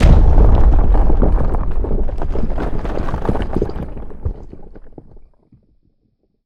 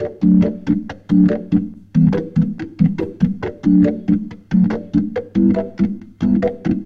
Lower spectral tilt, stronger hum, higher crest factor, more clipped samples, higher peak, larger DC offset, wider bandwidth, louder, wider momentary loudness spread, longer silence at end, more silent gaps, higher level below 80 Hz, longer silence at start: about the same, -9 dB/octave vs -10 dB/octave; neither; about the same, 14 dB vs 14 dB; neither; about the same, 0 dBFS vs -2 dBFS; neither; second, 5.2 kHz vs 6 kHz; about the same, -19 LUFS vs -17 LUFS; first, 16 LU vs 7 LU; first, 1.55 s vs 0 s; neither; first, -16 dBFS vs -40 dBFS; about the same, 0 s vs 0 s